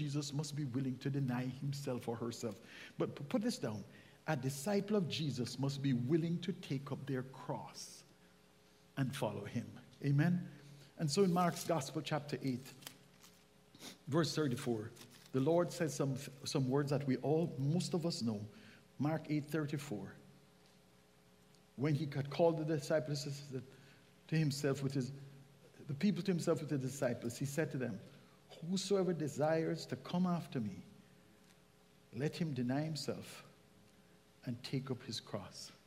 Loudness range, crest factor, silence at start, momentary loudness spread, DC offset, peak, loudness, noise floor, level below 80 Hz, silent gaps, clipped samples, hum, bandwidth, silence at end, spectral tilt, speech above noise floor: 6 LU; 20 dB; 0 s; 16 LU; under 0.1%; -20 dBFS; -39 LUFS; -67 dBFS; -76 dBFS; none; under 0.1%; none; 15.5 kHz; 0.1 s; -6 dB/octave; 29 dB